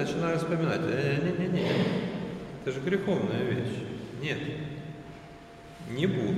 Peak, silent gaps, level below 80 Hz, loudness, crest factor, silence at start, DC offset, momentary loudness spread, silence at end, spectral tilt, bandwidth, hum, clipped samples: -14 dBFS; none; -58 dBFS; -30 LUFS; 16 dB; 0 s; under 0.1%; 17 LU; 0 s; -7 dB/octave; 13 kHz; none; under 0.1%